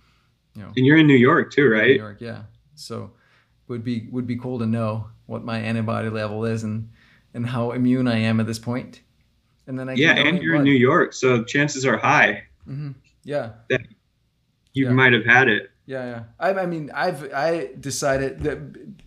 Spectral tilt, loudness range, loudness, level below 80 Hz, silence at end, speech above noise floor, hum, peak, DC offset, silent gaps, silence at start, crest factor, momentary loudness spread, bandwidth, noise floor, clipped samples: -5.5 dB/octave; 8 LU; -20 LUFS; -54 dBFS; 0.1 s; 46 dB; none; -2 dBFS; under 0.1%; none; 0.55 s; 20 dB; 19 LU; 13.5 kHz; -67 dBFS; under 0.1%